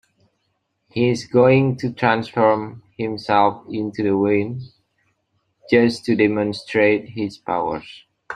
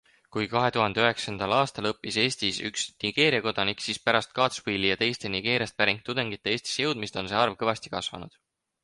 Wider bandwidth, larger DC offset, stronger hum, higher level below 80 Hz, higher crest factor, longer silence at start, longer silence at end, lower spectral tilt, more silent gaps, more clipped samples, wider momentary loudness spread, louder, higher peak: about the same, 10.5 kHz vs 11.5 kHz; neither; neither; about the same, -60 dBFS vs -60 dBFS; about the same, 18 dB vs 22 dB; first, 0.95 s vs 0.35 s; second, 0 s vs 0.55 s; first, -7 dB/octave vs -3.5 dB/octave; neither; neither; first, 12 LU vs 8 LU; first, -19 LUFS vs -26 LUFS; first, -2 dBFS vs -6 dBFS